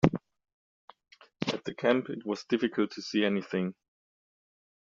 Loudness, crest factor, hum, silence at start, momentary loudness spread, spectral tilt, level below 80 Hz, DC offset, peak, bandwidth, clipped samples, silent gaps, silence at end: -31 LUFS; 30 dB; none; 0.05 s; 8 LU; -5 dB/octave; -58 dBFS; under 0.1%; -2 dBFS; 7.4 kHz; under 0.1%; 0.54-0.88 s; 1.15 s